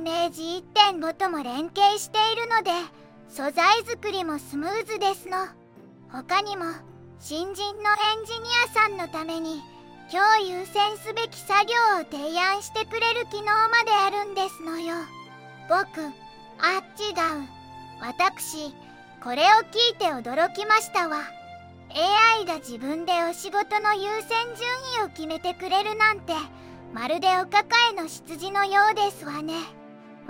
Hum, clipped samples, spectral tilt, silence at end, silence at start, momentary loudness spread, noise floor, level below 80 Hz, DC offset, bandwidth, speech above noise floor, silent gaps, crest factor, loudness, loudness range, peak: none; under 0.1%; -2 dB/octave; 0 s; 0 s; 16 LU; -50 dBFS; -68 dBFS; under 0.1%; 16.5 kHz; 25 dB; none; 22 dB; -24 LUFS; 6 LU; -4 dBFS